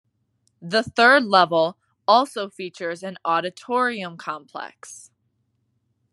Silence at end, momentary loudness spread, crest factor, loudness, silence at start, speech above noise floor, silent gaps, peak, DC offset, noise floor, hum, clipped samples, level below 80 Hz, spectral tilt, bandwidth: 1.15 s; 21 LU; 22 dB; -20 LUFS; 0.6 s; 49 dB; none; -2 dBFS; under 0.1%; -71 dBFS; none; under 0.1%; -72 dBFS; -4 dB/octave; 12 kHz